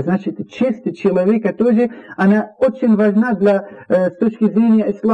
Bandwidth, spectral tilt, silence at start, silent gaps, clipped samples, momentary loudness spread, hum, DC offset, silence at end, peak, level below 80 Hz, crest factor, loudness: 5.8 kHz; -9 dB/octave; 0 s; none; under 0.1%; 6 LU; none; under 0.1%; 0 s; -6 dBFS; -58 dBFS; 10 dB; -16 LUFS